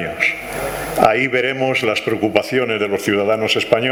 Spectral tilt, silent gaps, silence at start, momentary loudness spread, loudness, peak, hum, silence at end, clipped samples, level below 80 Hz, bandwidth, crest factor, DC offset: -4.5 dB/octave; none; 0 s; 6 LU; -17 LUFS; 0 dBFS; none; 0 s; under 0.1%; -46 dBFS; over 20 kHz; 18 dB; under 0.1%